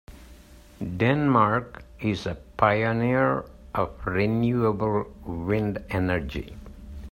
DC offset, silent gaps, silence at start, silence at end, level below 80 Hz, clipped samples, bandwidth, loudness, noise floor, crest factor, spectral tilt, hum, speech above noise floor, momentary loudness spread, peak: under 0.1%; none; 0.1 s; 0 s; -44 dBFS; under 0.1%; 16 kHz; -25 LUFS; -49 dBFS; 22 dB; -8 dB/octave; none; 24 dB; 15 LU; -4 dBFS